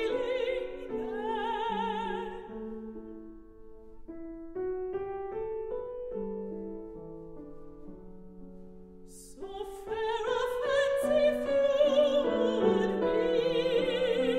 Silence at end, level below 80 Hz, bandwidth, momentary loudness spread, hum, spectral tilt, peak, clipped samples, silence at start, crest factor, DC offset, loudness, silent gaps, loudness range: 0 s; -54 dBFS; 14.5 kHz; 23 LU; none; -5.5 dB/octave; -14 dBFS; under 0.1%; 0 s; 18 dB; under 0.1%; -31 LUFS; none; 15 LU